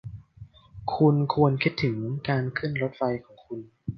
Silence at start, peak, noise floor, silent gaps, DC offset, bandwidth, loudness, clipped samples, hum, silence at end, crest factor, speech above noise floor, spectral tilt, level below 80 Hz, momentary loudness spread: 0.05 s; -8 dBFS; -49 dBFS; none; under 0.1%; 6.2 kHz; -26 LUFS; under 0.1%; none; 0 s; 20 dB; 25 dB; -9 dB/octave; -56 dBFS; 18 LU